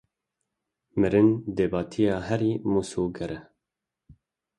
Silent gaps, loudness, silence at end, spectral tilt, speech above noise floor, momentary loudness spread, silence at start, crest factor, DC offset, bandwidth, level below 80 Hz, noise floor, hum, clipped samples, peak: none; -26 LUFS; 1.15 s; -7.5 dB/octave; 62 dB; 14 LU; 0.95 s; 18 dB; under 0.1%; 11.5 kHz; -52 dBFS; -87 dBFS; none; under 0.1%; -8 dBFS